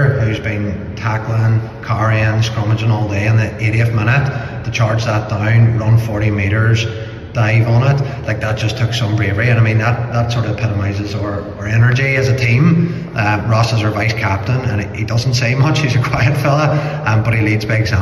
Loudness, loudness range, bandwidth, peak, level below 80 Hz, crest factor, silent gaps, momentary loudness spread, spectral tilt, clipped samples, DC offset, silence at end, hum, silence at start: -15 LUFS; 2 LU; 12 kHz; -2 dBFS; -36 dBFS; 12 dB; none; 7 LU; -6.5 dB/octave; under 0.1%; under 0.1%; 0 s; none; 0 s